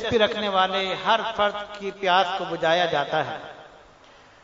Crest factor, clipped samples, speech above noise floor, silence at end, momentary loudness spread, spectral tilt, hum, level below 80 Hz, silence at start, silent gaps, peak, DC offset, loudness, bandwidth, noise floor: 20 dB; under 0.1%; 28 dB; 0.65 s; 11 LU; -4 dB/octave; none; -58 dBFS; 0 s; none; -6 dBFS; under 0.1%; -23 LUFS; 7.8 kHz; -51 dBFS